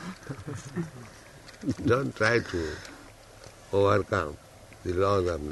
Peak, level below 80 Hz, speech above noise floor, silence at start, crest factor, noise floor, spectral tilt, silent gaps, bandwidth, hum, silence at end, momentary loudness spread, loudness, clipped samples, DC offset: -8 dBFS; -52 dBFS; 23 dB; 0 s; 20 dB; -50 dBFS; -6 dB/octave; none; 12 kHz; none; 0 s; 23 LU; -28 LUFS; under 0.1%; under 0.1%